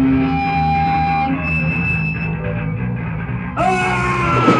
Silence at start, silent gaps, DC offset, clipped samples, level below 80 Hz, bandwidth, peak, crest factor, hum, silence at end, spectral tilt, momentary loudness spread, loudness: 0 s; none; under 0.1%; under 0.1%; -32 dBFS; 10.5 kHz; 0 dBFS; 16 dB; none; 0 s; -7 dB/octave; 7 LU; -18 LUFS